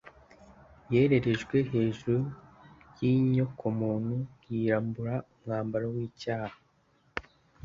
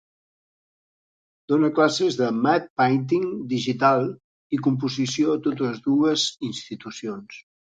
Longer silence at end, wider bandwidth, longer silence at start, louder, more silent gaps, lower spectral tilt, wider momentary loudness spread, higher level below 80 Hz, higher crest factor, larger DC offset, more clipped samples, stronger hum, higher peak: about the same, 0.45 s vs 0.35 s; second, 7.4 kHz vs 9.2 kHz; second, 0.05 s vs 1.5 s; second, -30 LUFS vs -23 LUFS; second, none vs 2.70-2.76 s, 4.24-4.50 s; first, -8.5 dB/octave vs -5 dB/octave; about the same, 13 LU vs 13 LU; first, -60 dBFS vs -68 dBFS; about the same, 20 dB vs 18 dB; neither; neither; neither; second, -10 dBFS vs -4 dBFS